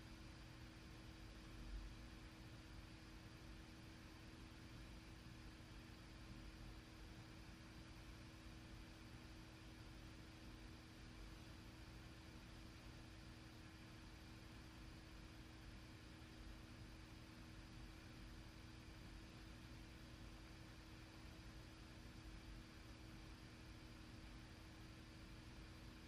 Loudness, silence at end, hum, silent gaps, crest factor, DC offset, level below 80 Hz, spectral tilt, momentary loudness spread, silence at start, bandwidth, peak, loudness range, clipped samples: -60 LUFS; 0 s; 60 Hz at -75 dBFS; none; 14 dB; under 0.1%; -64 dBFS; -5 dB/octave; 1 LU; 0 s; 15.5 kHz; -44 dBFS; 1 LU; under 0.1%